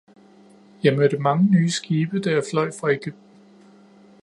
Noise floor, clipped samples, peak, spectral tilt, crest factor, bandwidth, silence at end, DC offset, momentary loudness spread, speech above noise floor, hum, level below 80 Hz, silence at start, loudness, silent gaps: -50 dBFS; under 0.1%; -2 dBFS; -6.5 dB/octave; 20 dB; 11.5 kHz; 1.1 s; under 0.1%; 7 LU; 30 dB; none; -68 dBFS; 0.85 s; -21 LUFS; none